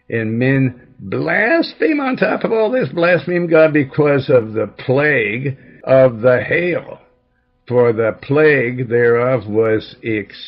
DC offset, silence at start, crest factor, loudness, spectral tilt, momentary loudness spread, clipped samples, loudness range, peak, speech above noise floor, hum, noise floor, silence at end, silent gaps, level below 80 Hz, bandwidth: under 0.1%; 0.1 s; 14 dB; -15 LUFS; -10.5 dB/octave; 10 LU; under 0.1%; 2 LU; -2 dBFS; 46 dB; none; -61 dBFS; 0 s; none; -56 dBFS; 5.8 kHz